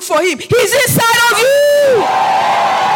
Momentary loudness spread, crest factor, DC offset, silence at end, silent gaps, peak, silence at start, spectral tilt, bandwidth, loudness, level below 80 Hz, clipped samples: 4 LU; 10 dB; under 0.1%; 0 s; none; -2 dBFS; 0 s; -3 dB/octave; 17.5 kHz; -11 LUFS; -50 dBFS; under 0.1%